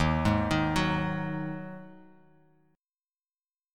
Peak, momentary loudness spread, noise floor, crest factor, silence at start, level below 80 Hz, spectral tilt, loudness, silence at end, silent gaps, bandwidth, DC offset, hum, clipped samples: -12 dBFS; 15 LU; under -90 dBFS; 20 dB; 0 s; -44 dBFS; -6.5 dB/octave; -29 LUFS; 1.75 s; none; 14 kHz; under 0.1%; none; under 0.1%